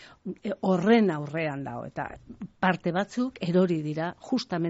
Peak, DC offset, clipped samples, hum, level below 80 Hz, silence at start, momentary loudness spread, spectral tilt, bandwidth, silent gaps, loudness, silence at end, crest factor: -8 dBFS; under 0.1%; under 0.1%; none; -62 dBFS; 0 s; 15 LU; -5.5 dB/octave; 8 kHz; none; -27 LUFS; 0 s; 18 dB